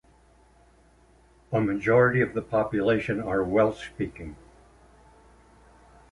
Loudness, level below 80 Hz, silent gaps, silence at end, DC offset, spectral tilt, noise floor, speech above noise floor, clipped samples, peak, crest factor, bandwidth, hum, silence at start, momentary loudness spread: -25 LUFS; -52 dBFS; none; 1.75 s; under 0.1%; -8 dB/octave; -58 dBFS; 34 dB; under 0.1%; -8 dBFS; 20 dB; 11 kHz; none; 1.5 s; 13 LU